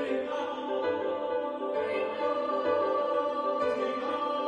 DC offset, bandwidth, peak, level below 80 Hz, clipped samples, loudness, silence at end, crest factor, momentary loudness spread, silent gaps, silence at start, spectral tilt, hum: under 0.1%; 8.8 kHz; -16 dBFS; -72 dBFS; under 0.1%; -30 LUFS; 0 s; 14 dB; 4 LU; none; 0 s; -5 dB/octave; none